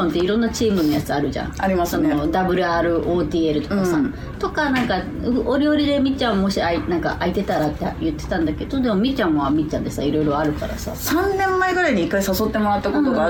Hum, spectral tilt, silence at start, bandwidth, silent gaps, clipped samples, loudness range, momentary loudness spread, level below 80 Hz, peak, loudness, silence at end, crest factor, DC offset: none; -5.5 dB/octave; 0 s; over 20 kHz; none; under 0.1%; 1 LU; 5 LU; -36 dBFS; -6 dBFS; -20 LUFS; 0 s; 14 dB; under 0.1%